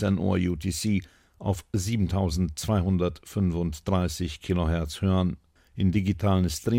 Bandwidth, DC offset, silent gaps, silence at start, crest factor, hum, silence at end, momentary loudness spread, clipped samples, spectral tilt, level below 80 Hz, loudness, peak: 16.5 kHz; under 0.1%; none; 0 s; 14 dB; none; 0 s; 6 LU; under 0.1%; -6.5 dB/octave; -40 dBFS; -27 LUFS; -12 dBFS